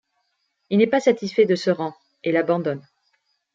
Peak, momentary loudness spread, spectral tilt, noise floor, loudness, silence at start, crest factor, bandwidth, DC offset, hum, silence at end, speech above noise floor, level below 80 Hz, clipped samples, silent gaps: -4 dBFS; 11 LU; -6.5 dB/octave; -72 dBFS; -21 LUFS; 0.7 s; 18 dB; 7.8 kHz; under 0.1%; none; 0.75 s; 52 dB; -72 dBFS; under 0.1%; none